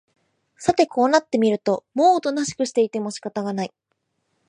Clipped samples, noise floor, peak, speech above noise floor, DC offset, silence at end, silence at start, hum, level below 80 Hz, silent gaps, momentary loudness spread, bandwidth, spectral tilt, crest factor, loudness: under 0.1%; -74 dBFS; -4 dBFS; 53 dB; under 0.1%; 0.8 s; 0.6 s; none; -62 dBFS; none; 10 LU; 10.5 kHz; -4.5 dB/octave; 18 dB; -21 LUFS